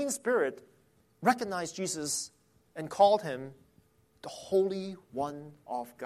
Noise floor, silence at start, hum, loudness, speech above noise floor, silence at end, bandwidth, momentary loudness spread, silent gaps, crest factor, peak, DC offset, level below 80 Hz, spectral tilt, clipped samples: -66 dBFS; 0 s; none; -31 LUFS; 35 dB; 0 s; 15 kHz; 20 LU; none; 22 dB; -12 dBFS; under 0.1%; -72 dBFS; -3.5 dB/octave; under 0.1%